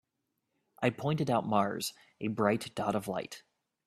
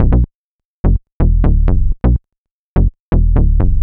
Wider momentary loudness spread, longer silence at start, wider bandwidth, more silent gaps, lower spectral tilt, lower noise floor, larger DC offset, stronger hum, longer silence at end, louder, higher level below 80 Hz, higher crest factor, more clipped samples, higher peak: first, 10 LU vs 6 LU; first, 0.8 s vs 0 s; first, 14.5 kHz vs 2.8 kHz; second, none vs 0.35-0.59 s, 0.65-0.84 s, 1.12-1.20 s, 2.38-2.45 s, 2.51-2.76 s, 3.00-3.12 s; second, -5.5 dB/octave vs -12.5 dB/octave; about the same, -83 dBFS vs -83 dBFS; neither; neither; first, 0.5 s vs 0 s; second, -33 LUFS vs -16 LUFS; second, -70 dBFS vs -14 dBFS; first, 22 dB vs 10 dB; neither; second, -12 dBFS vs -2 dBFS